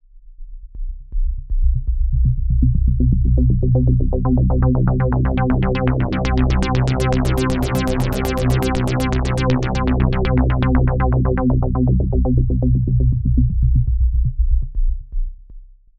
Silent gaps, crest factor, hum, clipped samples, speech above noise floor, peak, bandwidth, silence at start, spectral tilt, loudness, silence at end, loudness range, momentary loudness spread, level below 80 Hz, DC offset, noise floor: none; 14 dB; none; under 0.1%; 23 dB; -2 dBFS; 14.5 kHz; 0.15 s; -8 dB/octave; -18 LUFS; 0.35 s; 2 LU; 7 LU; -20 dBFS; under 0.1%; -39 dBFS